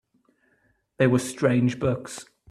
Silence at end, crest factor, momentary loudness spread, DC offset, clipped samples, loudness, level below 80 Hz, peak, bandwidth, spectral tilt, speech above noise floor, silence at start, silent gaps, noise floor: 0.25 s; 20 dB; 14 LU; under 0.1%; under 0.1%; -24 LUFS; -58 dBFS; -6 dBFS; 13.5 kHz; -6.5 dB/octave; 44 dB; 1 s; none; -67 dBFS